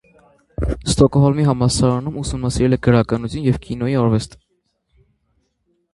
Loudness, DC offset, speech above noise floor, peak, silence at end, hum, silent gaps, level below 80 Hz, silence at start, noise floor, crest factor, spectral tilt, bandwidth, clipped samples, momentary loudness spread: -18 LUFS; under 0.1%; 52 dB; 0 dBFS; 1.65 s; none; none; -34 dBFS; 0.6 s; -68 dBFS; 18 dB; -6.5 dB/octave; 11.5 kHz; under 0.1%; 10 LU